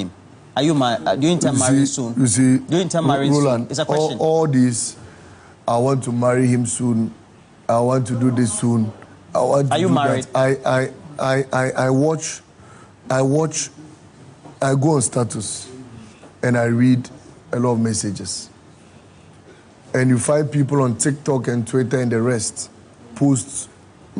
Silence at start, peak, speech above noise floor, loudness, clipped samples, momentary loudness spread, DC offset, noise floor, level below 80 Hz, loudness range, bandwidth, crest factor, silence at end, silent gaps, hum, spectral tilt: 0 s; -4 dBFS; 28 dB; -19 LUFS; under 0.1%; 11 LU; under 0.1%; -46 dBFS; -58 dBFS; 4 LU; 10.5 kHz; 16 dB; 0 s; none; none; -5.5 dB/octave